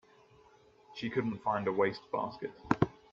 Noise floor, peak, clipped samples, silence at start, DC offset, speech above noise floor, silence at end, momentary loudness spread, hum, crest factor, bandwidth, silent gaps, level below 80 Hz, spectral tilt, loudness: -62 dBFS; -10 dBFS; under 0.1%; 0.9 s; under 0.1%; 29 dB; 0.2 s; 10 LU; none; 26 dB; 7.4 kHz; none; -62 dBFS; -7.5 dB/octave; -34 LUFS